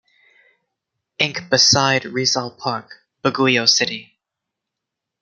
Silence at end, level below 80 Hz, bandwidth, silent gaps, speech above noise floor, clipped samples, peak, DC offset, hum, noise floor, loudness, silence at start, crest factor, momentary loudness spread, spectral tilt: 1.2 s; -64 dBFS; 12 kHz; none; 64 dB; under 0.1%; -2 dBFS; under 0.1%; none; -83 dBFS; -17 LUFS; 1.2 s; 20 dB; 13 LU; -2.5 dB/octave